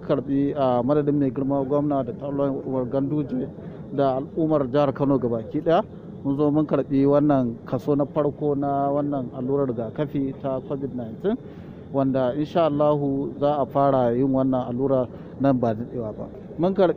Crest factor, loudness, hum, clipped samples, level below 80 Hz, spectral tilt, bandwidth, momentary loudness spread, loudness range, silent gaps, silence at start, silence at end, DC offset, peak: 16 dB; -23 LUFS; none; under 0.1%; -52 dBFS; -10 dB/octave; 5 kHz; 9 LU; 4 LU; none; 0 s; 0 s; under 0.1%; -8 dBFS